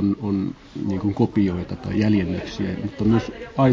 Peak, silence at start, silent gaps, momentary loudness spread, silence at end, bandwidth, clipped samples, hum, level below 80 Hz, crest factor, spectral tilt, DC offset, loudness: -4 dBFS; 0 s; none; 8 LU; 0 s; 7.4 kHz; under 0.1%; none; -42 dBFS; 16 dB; -8.5 dB/octave; under 0.1%; -23 LUFS